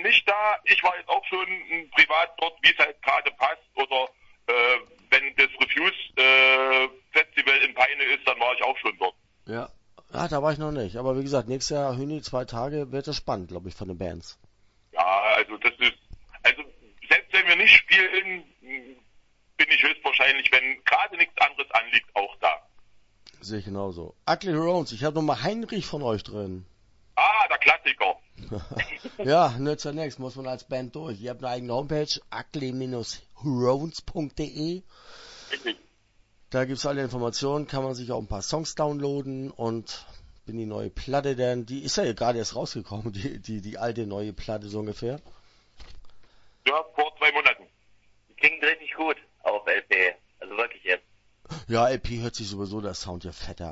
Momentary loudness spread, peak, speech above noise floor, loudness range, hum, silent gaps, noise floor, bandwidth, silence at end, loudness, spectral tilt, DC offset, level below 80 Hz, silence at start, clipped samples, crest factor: 17 LU; 0 dBFS; 35 dB; 12 LU; none; none; -63 dBFS; 8 kHz; 0 s; -23 LUFS; -4 dB/octave; under 0.1%; -52 dBFS; 0 s; under 0.1%; 24 dB